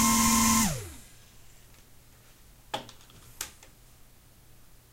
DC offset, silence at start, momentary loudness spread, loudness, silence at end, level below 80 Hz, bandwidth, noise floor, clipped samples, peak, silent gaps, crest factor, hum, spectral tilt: under 0.1%; 0 s; 24 LU; -26 LUFS; 1.45 s; -48 dBFS; 16.5 kHz; -55 dBFS; under 0.1%; -12 dBFS; none; 20 dB; none; -2.5 dB/octave